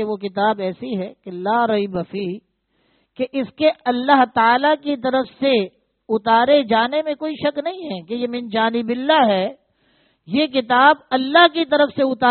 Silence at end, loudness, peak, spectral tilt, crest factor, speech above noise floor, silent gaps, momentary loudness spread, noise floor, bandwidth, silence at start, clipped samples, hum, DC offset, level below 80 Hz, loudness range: 0 s; -18 LUFS; 0 dBFS; -2 dB/octave; 18 dB; 46 dB; none; 13 LU; -64 dBFS; 4.6 kHz; 0 s; under 0.1%; none; under 0.1%; -62 dBFS; 6 LU